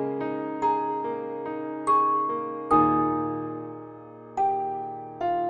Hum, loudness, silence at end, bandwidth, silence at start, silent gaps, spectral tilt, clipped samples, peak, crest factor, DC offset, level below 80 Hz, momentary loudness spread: none; -26 LUFS; 0 s; 9.8 kHz; 0 s; none; -7.5 dB/octave; under 0.1%; -8 dBFS; 18 dB; under 0.1%; -60 dBFS; 15 LU